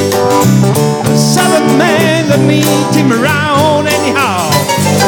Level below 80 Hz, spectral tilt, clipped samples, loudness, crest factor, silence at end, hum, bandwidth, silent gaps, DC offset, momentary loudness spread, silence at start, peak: -46 dBFS; -5 dB/octave; under 0.1%; -9 LUFS; 10 dB; 0 s; none; 19.5 kHz; none; under 0.1%; 2 LU; 0 s; 0 dBFS